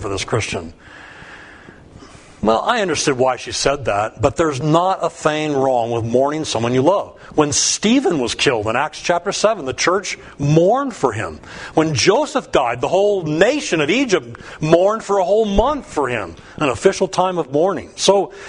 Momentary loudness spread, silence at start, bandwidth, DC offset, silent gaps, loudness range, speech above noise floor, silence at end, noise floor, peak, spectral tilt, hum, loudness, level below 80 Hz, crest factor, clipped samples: 7 LU; 0 s; 10.5 kHz; under 0.1%; none; 2 LU; 24 dB; 0 s; -41 dBFS; 0 dBFS; -4 dB/octave; none; -17 LUFS; -42 dBFS; 18 dB; under 0.1%